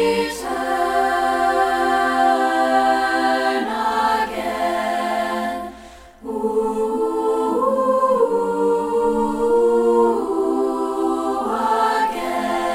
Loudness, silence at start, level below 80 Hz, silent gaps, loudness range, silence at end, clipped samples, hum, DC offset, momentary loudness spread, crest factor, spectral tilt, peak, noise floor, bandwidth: -19 LUFS; 0 s; -48 dBFS; none; 4 LU; 0 s; under 0.1%; none; under 0.1%; 6 LU; 14 dB; -4 dB/octave; -6 dBFS; -41 dBFS; 16 kHz